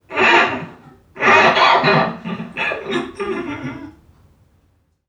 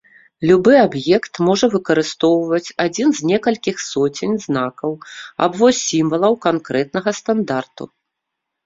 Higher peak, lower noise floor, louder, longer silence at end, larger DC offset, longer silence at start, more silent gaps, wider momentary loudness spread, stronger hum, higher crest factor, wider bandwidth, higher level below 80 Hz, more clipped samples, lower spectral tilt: about the same, 0 dBFS vs 0 dBFS; second, -60 dBFS vs -79 dBFS; about the same, -15 LUFS vs -17 LUFS; first, 1.2 s vs 0.8 s; neither; second, 0.1 s vs 0.4 s; neither; first, 17 LU vs 10 LU; neither; about the same, 18 dB vs 16 dB; first, 10.5 kHz vs 7.8 kHz; about the same, -54 dBFS vs -56 dBFS; neither; about the same, -4.5 dB/octave vs -5 dB/octave